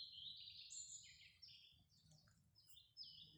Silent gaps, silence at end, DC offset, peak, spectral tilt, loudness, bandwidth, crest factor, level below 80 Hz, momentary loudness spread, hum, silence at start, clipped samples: none; 0 s; under 0.1%; -42 dBFS; 0.5 dB/octave; -57 LUFS; over 20 kHz; 20 dB; -86 dBFS; 12 LU; none; 0 s; under 0.1%